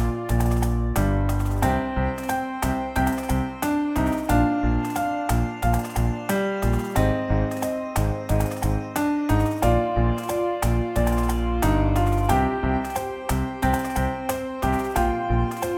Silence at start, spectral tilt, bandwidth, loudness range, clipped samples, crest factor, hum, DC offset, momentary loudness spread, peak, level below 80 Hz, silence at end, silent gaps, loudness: 0 s; -6.5 dB/octave; 18.5 kHz; 2 LU; under 0.1%; 16 dB; none; under 0.1%; 5 LU; -6 dBFS; -28 dBFS; 0 s; none; -24 LUFS